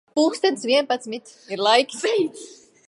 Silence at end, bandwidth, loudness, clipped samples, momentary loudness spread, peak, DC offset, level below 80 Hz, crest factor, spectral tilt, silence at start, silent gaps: 0.35 s; 11.5 kHz; -21 LUFS; under 0.1%; 16 LU; -2 dBFS; under 0.1%; -78 dBFS; 20 dB; -2.5 dB/octave; 0.15 s; none